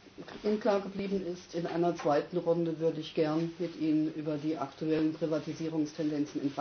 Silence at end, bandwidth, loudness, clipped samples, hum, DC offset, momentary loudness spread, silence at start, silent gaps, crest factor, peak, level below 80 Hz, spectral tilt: 0 s; 6.6 kHz; -32 LUFS; under 0.1%; none; under 0.1%; 6 LU; 0.05 s; none; 16 dB; -16 dBFS; -68 dBFS; -7 dB/octave